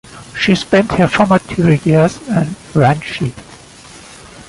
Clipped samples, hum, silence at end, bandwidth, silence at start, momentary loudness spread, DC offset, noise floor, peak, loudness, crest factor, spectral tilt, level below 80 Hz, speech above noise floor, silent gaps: under 0.1%; none; 0.05 s; 11.5 kHz; 0.1 s; 11 LU; under 0.1%; -38 dBFS; 0 dBFS; -14 LUFS; 14 dB; -6.5 dB/octave; -40 dBFS; 25 dB; none